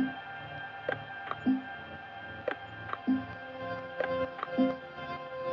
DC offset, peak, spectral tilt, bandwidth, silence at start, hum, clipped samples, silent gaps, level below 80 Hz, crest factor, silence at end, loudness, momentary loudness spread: under 0.1%; -16 dBFS; -8 dB/octave; 5.8 kHz; 0 s; none; under 0.1%; none; -70 dBFS; 18 dB; 0 s; -36 LUFS; 11 LU